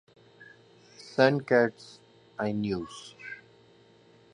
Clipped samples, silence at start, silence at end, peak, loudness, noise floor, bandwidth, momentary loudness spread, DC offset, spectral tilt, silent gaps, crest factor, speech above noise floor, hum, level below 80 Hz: under 0.1%; 0.4 s; 0.95 s; -6 dBFS; -27 LUFS; -59 dBFS; 10.5 kHz; 24 LU; under 0.1%; -6 dB/octave; none; 26 dB; 32 dB; none; -66 dBFS